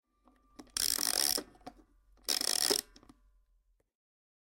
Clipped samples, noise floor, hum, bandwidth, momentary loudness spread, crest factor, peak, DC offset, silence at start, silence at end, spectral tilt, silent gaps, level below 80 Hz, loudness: under 0.1%; -73 dBFS; none; 17 kHz; 12 LU; 24 dB; -12 dBFS; under 0.1%; 0.6 s; 1.7 s; 1 dB/octave; none; -66 dBFS; -30 LUFS